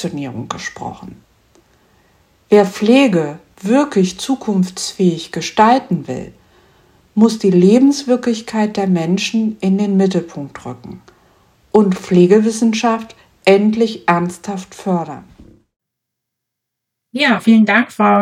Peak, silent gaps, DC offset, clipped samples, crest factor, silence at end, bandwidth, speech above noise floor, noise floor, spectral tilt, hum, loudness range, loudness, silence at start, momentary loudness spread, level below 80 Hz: 0 dBFS; none; under 0.1%; under 0.1%; 16 dB; 0 s; 14 kHz; 64 dB; -79 dBFS; -6 dB/octave; none; 4 LU; -14 LUFS; 0 s; 18 LU; -56 dBFS